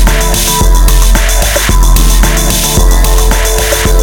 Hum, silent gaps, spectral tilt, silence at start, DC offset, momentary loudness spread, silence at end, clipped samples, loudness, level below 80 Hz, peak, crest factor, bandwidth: none; none; -3 dB/octave; 0 s; under 0.1%; 1 LU; 0 s; 0.5%; -9 LUFS; -8 dBFS; 0 dBFS; 6 dB; over 20 kHz